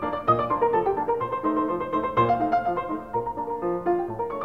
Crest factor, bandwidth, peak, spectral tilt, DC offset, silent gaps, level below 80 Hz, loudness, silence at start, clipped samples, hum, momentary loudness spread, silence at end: 18 dB; 6.4 kHz; -8 dBFS; -8.5 dB/octave; 0.2%; none; -52 dBFS; -25 LUFS; 0 s; under 0.1%; none; 7 LU; 0 s